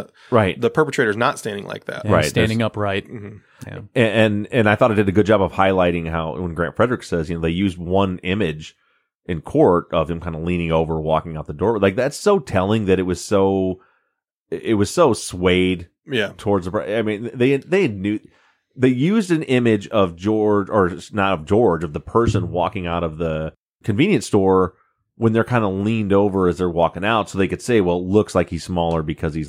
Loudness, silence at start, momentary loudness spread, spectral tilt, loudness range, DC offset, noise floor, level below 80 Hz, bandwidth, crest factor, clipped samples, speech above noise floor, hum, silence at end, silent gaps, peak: -19 LUFS; 0 s; 9 LU; -6.5 dB/octave; 3 LU; under 0.1%; -74 dBFS; -44 dBFS; 15.5 kHz; 18 dB; under 0.1%; 55 dB; none; 0 s; 9.15-9.19 s, 14.32-14.46 s, 23.57-23.79 s; -2 dBFS